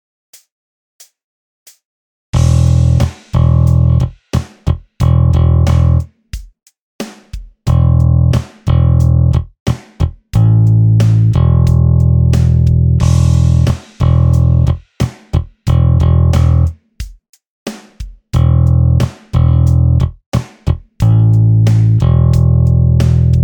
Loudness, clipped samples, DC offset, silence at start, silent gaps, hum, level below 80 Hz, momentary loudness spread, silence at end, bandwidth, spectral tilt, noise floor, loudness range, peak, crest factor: -12 LUFS; under 0.1%; under 0.1%; 2.35 s; 6.81-6.99 s, 9.60-9.66 s, 17.29-17.33 s, 17.47-17.66 s, 20.26-20.32 s; none; -20 dBFS; 15 LU; 0 s; 9.4 kHz; -8 dB/octave; -29 dBFS; 4 LU; 0 dBFS; 10 dB